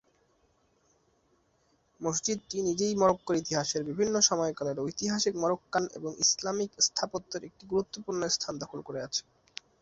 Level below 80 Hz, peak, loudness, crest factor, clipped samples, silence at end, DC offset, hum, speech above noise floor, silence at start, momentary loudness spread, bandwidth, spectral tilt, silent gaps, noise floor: -66 dBFS; -10 dBFS; -30 LUFS; 22 dB; under 0.1%; 0.6 s; under 0.1%; none; 40 dB; 2 s; 12 LU; 8.2 kHz; -3 dB/octave; none; -70 dBFS